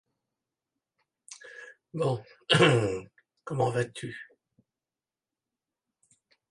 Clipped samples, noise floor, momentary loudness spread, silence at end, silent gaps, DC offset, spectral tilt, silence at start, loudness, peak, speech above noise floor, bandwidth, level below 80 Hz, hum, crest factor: under 0.1%; under -90 dBFS; 26 LU; 2.25 s; none; under 0.1%; -5 dB/octave; 1.3 s; -27 LUFS; -6 dBFS; over 63 dB; 11.5 kHz; -66 dBFS; none; 26 dB